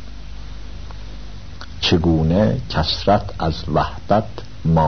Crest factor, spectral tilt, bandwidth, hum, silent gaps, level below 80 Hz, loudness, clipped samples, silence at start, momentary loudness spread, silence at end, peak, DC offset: 18 dB; -7 dB/octave; 6.6 kHz; 50 Hz at -35 dBFS; none; -32 dBFS; -19 LUFS; under 0.1%; 0 s; 20 LU; 0 s; -2 dBFS; 2%